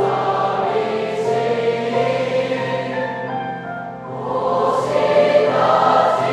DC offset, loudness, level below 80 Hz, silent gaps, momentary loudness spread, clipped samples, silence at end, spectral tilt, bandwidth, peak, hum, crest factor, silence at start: under 0.1%; -18 LUFS; -58 dBFS; none; 11 LU; under 0.1%; 0 s; -6 dB/octave; 11.5 kHz; -2 dBFS; none; 16 dB; 0 s